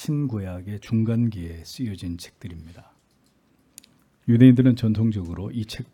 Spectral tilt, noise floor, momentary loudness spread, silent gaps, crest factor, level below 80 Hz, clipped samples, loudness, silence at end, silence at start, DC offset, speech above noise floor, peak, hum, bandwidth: -8 dB/octave; -63 dBFS; 21 LU; none; 20 dB; -54 dBFS; under 0.1%; -22 LUFS; 0.1 s; 0 s; under 0.1%; 41 dB; -4 dBFS; none; 13.5 kHz